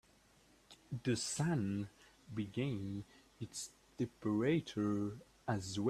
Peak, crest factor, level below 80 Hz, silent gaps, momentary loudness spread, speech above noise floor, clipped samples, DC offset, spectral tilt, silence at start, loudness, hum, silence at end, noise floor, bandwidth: -22 dBFS; 18 dB; -70 dBFS; none; 13 LU; 30 dB; under 0.1%; under 0.1%; -5.5 dB/octave; 0.7 s; -40 LUFS; none; 0 s; -68 dBFS; 14 kHz